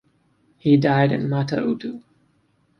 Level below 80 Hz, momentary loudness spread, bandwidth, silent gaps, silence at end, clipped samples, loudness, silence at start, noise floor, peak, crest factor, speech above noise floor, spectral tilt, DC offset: -60 dBFS; 14 LU; 6.2 kHz; none; 0.8 s; under 0.1%; -20 LUFS; 0.65 s; -64 dBFS; -4 dBFS; 18 dB; 44 dB; -8.5 dB/octave; under 0.1%